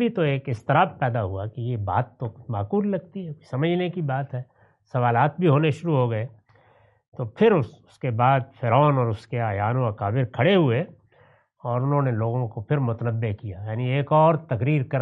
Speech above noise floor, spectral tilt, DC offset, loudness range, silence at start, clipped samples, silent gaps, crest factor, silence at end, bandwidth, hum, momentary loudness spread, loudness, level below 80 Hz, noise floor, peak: 36 dB; -9 dB/octave; under 0.1%; 4 LU; 0 s; under 0.1%; 7.08-7.12 s; 18 dB; 0 s; 5.8 kHz; none; 13 LU; -23 LUFS; -66 dBFS; -58 dBFS; -6 dBFS